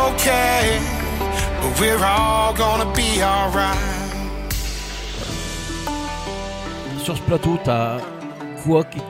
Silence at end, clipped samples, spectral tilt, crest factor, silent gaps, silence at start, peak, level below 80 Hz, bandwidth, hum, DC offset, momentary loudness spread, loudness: 0 s; under 0.1%; -4 dB/octave; 18 dB; none; 0 s; -4 dBFS; -30 dBFS; 16.5 kHz; none; under 0.1%; 12 LU; -20 LUFS